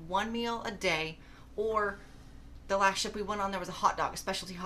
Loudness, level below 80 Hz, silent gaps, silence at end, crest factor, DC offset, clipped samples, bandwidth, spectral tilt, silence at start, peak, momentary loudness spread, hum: -32 LUFS; -52 dBFS; none; 0 s; 22 dB; under 0.1%; under 0.1%; 15 kHz; -3 dB/octave; 0 s; -12 dBFS; 9 LU; none